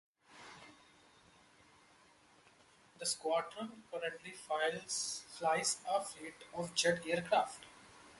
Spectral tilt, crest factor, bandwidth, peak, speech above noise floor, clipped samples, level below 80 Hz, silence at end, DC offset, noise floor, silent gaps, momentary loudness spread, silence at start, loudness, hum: -2 dB/octave; 20 dB; 11.5 kHz; -20 dBFS; 28 dB; under 0.1%; -78 dBFS; 0 s; under 0.1%; -66 dBFS; none; 21 LU; 0.3 s; -37 LUFS; none